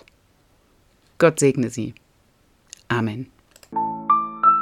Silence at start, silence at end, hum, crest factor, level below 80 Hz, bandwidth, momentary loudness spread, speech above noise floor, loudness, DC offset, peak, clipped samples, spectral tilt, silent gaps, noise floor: 1.2 s; 0 s; none; 20 dB; -62 dBFS; 15.5 kHz; 15 LU; 40 dB; -21 LUFS; under 0.1%; -2 dBFS; under 0.1%; -5.5 dB/octave; none; -60 dBFS